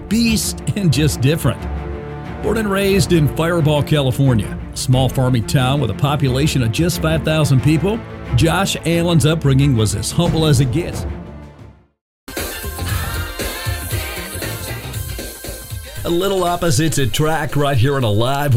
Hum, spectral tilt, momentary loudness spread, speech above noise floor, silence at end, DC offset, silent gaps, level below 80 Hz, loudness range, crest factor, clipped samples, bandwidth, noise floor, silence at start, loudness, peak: none; -5.5 dB/octave; 12 LU; 26 dB; 0 s; under 0.1%; 12.01-12.27 s; -30 dBFS; 8 LU; 14 dB; under 0.1%; 16.5 kHz; -42 dBFS; 0 s; -17 LUFS; -2 dBFS